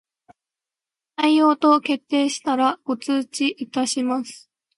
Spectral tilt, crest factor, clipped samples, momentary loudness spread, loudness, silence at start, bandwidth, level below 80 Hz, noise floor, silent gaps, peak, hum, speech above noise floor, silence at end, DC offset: -2.5 dB/octave; 18 dB; under 0.1%; 10 LU; -21 LUFS; 1.2 s; 11.5 kHz; -76 dBFS; -89 dBFS; none; -4 dBFS; none; 69 dB; 0.4 s; under 0.1%